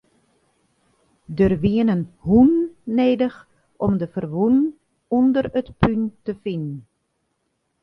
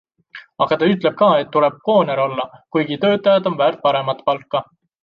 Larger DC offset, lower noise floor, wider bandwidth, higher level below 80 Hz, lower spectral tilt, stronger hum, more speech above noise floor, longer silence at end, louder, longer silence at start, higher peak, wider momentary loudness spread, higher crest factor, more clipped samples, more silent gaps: neither; first, -72 dBFS vs -42 dBFS; about the same, 5.6 kHz vs 5.4 kHz; first, -44 dBFS vs -62 dBFS; first, -10 dB/octave vs -8 dB/octave; neither; first, 53 dB vs 25 dB; first, 1 s vs 0.4 s; about the same, -20 LUFS vs -18 LUFS; first, 1.3 s vs 0.35 s; about the same, 0 dBFS vs -2 dBFS; first, 11 LU vs 8 LU; about the same, 20 dB vs 16 dB; neither; neither